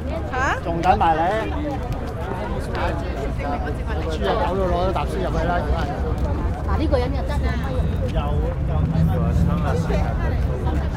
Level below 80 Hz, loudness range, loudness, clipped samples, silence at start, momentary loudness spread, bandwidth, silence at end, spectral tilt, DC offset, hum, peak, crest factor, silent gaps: -26 dBFS; 2 LU; -22 LUFS; under 0.1%; 0 s; 6 LU; 12.5 kHz; 0 s; -7.5 dB/octave; under 0.1%; none; -4 dBFS; 16 dB; none